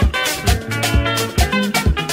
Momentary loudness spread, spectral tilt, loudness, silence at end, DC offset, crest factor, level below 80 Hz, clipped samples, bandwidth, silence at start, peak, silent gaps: 2 LU; -4 dB/octave; -17 LUFS; 0 s; under 0.1%; 14 dB; -22 dBFS; under 0.1%; 16.5 kHz; 0 s; -2 dBFS; none